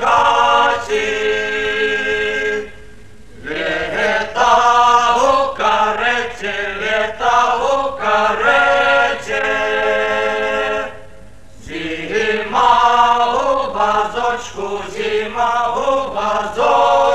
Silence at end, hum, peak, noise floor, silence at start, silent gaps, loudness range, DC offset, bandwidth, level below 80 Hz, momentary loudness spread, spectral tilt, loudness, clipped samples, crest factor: 0 s; none; 0 dBFS; -41 dBFS; 0 s; none; 4 LU; 2%; 13.5 kHz; -44 dBFS; 10 LU; -2.5 dB/octave; -15 LUFS; under 0.1%; 16 dB